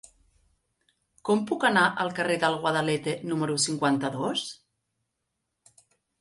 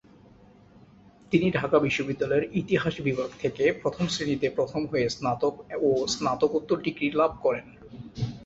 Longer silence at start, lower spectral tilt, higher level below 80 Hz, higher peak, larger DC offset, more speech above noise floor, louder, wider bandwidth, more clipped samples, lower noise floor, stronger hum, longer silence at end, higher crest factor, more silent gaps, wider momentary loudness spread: about the same, 1.25 s vs 1.3 s; second, -4 dB/octave vs -5.5 dB/octave; second, -70 dBFS vs -56 dBFS; about the same, -8 dBFS vs -8 dBFS; neither; first, 55 dB vs 28 dB; about the same, -26 LUFS vs -27 LUFS; first, 11.5 kHz vs 8 kHz; neither; first, -81 dBFS vs -54 dBFS; neither; first, 1.65 s vs 0 s; about the same, 20 dB vs 20 dB; neither; about the same, 7 LU vs 6 LU